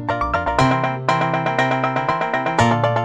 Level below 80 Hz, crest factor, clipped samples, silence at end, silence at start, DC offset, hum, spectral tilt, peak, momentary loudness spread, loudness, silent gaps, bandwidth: -40 dBFS; 18 dB; under 0.1%; 0 s; 0 s; under 0.1%; none; -6 dB/octave; -2 dBFS; 3 LU; -19 LUFS; none; 11 kHz